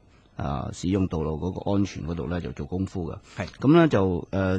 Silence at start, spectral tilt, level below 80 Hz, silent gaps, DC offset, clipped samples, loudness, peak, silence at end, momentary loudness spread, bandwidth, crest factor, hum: 0.4 s; -7.5 dB/octave; -44 dBFS; none; under 0.1%; under 0.1%; -26 LUFS; -4 dBFS; 0 s; 16 LU; 9 kHz; 20 dB; none